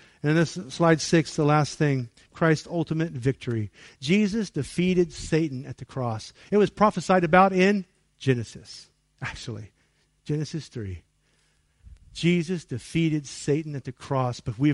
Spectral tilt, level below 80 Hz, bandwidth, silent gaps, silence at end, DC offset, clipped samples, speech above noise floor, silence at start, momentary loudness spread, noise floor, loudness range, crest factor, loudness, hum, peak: -6 dB/octave; -54 dBFS; 11.5 kHz; none; 0 s; under 0.1%; under 0.1%; 42 dB; 0.25 s; 16 LU; -67 dBFS; 9 LU; 20 dB; -25 LUFS; none; -6 dBFS